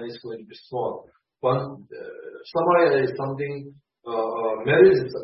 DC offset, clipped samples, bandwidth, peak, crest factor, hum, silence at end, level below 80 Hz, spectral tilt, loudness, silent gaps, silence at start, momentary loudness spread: under 0.1%; under 0.1%; 5.8 kHz; -4 dBFS; 20 dB; none; 0 s; -62 dBFS; -11 dB/octave; -22 LUFS; none; 0 s; 23 LU